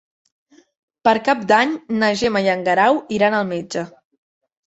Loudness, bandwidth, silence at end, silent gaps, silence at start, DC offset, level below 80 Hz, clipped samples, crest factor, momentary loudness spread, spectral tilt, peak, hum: -18 LUFS; 8.2 kHz; 0.8 s; none; 1.05 s; under 0.1%; -58 dBFS; under 0.1%; 18 dB; 9 LU; -5 dB/octave; -2 dBFS; none